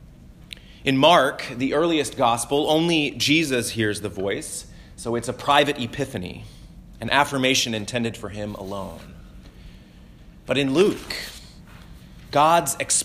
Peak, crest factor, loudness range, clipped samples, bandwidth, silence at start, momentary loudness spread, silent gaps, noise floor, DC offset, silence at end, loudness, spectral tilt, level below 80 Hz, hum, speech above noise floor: -2 dBFS; 20 dB; 7 LU; under 0.1%; 16 kHz; 0 s; 17 LU; none; -46 dBFS; under 0.1%; 0 s; -22 LUFS; -3.5 dB/octave; -48 dBFS; none; 24 dB